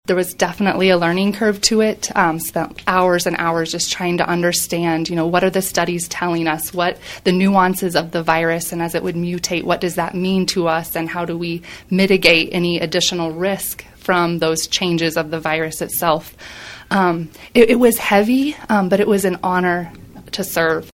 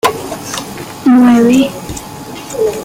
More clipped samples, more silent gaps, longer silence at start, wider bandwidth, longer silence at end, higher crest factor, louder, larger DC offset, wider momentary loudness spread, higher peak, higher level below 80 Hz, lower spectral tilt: neither; neither; about the same, 0.1 s vs 0.05 s; about the same, 17 kHz vs 16.5 kHz; about the same, 0.1 s vs 0 s; first, 18 dB vs 12 dB; second, -17 LUFS vs -11 LUFS; neither; second, 8 LU vs 18 LU; about the same, 0 dBFS vs 0 dBFS; second, -48 dBFS vs -42 dBFS; about the same, -4 dB/octave vs -5 dB/octave